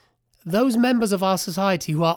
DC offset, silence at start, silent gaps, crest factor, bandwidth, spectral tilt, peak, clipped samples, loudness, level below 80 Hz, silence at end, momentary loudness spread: under 0.1%; 0.45 s; none; 14 dB; 19.5 kHz; -5.5 dB/octave; -8 dBFS; under 0.1%; -21 LUFS; -58 dBFS; 0 s; 5 LU